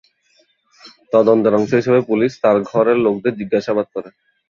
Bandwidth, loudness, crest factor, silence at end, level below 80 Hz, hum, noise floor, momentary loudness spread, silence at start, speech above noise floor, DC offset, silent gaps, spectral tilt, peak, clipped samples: 7.2 kHz; -16 LUFS; 16 dB; 0.4 s; -60 dBFS; none; -59 dBFS; 8 LU; 0.85 s; 44 dB; under 0.1%; none; -7.5 dB/octave; -2 dBFS; under 0.1%